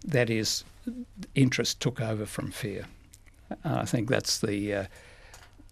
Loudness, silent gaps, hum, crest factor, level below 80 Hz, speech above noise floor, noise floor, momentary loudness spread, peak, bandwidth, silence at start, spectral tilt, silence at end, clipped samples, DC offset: -29 LUFS; none; none; 24 dB; -54 dBFS; 25 dB; -54 dBFS; 15 LU; -8 dBFS; 14.5 kHz; 0 s; -4.5 dB/octave; 0.05 s; under 0.1%; under 0.1%